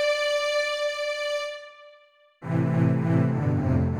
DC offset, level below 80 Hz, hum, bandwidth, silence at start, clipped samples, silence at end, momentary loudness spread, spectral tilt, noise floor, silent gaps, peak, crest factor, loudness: under 0.1%; -50 dBFS; none; 12 kHz; 0 s; under 0.1%; 0 s; 11 LU; -6 dB/octave; -57 dBFS; none; -8 dBFS; 16 dB; -25 LUFS